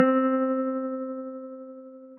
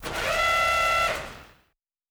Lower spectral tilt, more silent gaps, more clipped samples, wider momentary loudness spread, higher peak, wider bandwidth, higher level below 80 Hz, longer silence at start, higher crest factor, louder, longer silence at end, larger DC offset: first, -10 dB/octave vs -1.5 dB/octave; neither; neither; first, 19 LU vs 11 LU; first, -6 dBFS vs -10 dBFS; second, 3.1 kHz vs over 20 kHz; second, under -90 dBFS vs -46 dBFS; about the same, 0 s vs 0 s; first, 22 dB vs 16 dB; second, -27 LUFS vs -23 LUFS; second, 0 s vs 0.65 s; neither